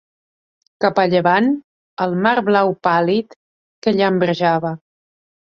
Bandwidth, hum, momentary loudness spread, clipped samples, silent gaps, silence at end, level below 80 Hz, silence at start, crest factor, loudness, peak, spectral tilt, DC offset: 7.2 kHz; none; 10 LU; under 0.1%; 1.64-1.97 s, 3.36-3.82 s; 0.7 s; -62 dBFS; 0.8 s; 18 dB; -17 LUFS; -2 dBFS; -7.5 dB/octave; under 0.1%